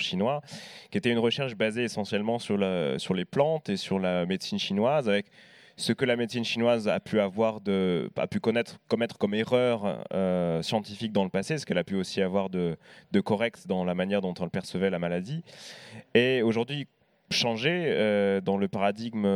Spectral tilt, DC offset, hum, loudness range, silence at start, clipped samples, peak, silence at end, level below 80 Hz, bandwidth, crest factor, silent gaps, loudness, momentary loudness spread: -5.5 dB/octave; under 0.1%; none; 2 LU; 0 s; under 0.1%; -6 dBFS; 0 s; -68 dBFS; 14 kHz; 22 dB; none; -28 LUFS; 8 LU